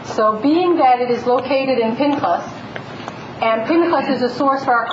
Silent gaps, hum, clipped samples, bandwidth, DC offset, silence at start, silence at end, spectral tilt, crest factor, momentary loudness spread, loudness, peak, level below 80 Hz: none; none; under 0.1%; 7.8 kHz; under 0.1%; 0 s; 0 s; -6 dB/octave; 14 dB; 16 LU; -17 LUFS; -4 dBFS; -60 dBFS